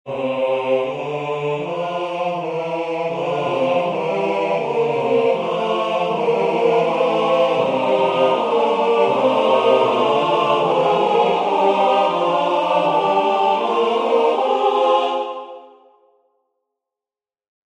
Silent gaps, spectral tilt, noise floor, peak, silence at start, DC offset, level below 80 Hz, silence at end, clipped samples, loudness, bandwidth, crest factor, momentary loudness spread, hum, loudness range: none; -5.5 dB/octave; under -90 dBFS; -4 dBFS; 0.05 s; under 0.1%; -66 dBFS; 2.05 s; under 0.1%; -18 LUFS; 9.6 kHz; 14 dB; 7 LU; none; 6 LU